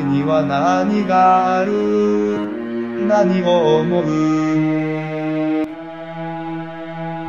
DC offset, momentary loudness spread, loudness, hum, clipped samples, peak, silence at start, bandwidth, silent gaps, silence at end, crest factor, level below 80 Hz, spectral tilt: 0.2%; 13 LU; -17 LUFS; none; under 0.1%; -4 dBFS; 0 s; 7.2 kHz; none; 0 s; 14 dB; -60 dBFS; -7 dB/octave